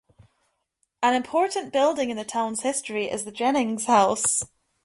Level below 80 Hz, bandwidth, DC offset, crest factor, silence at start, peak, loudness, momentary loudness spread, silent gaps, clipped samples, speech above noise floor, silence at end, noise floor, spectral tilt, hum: -64 dBFS; 11.5 kHz; under 0.1%; 18 dB; 1 s; -6 dBFS; -24 LUFS; 8 LU; none; under 0.1%; 50 dB; 0.4 s; -74 dBFS; -2.5 dB/octave; none